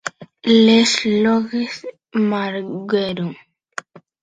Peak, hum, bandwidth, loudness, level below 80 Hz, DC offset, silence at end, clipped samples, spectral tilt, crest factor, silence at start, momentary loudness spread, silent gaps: -2 dBFS; none; 9.2 kHz; -17 LUFS; -62 dBFS; under 0.1%; 0.25 s; under 0.1%; -4.5 dB/octave; 16 dB; 0.05 s; 20 LU; none